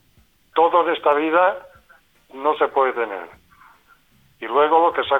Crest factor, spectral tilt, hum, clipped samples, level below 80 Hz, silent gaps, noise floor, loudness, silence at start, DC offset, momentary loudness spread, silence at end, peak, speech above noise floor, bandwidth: 16 dB; -5.5 dB/octave; none; under 0.1%; -64 dBFS; none; -58 dBFS; -19 LUFS; 0.55 s; under 0.1%; 11 LU; 0 s; -4 dBFS; 40 dB; 16 kHz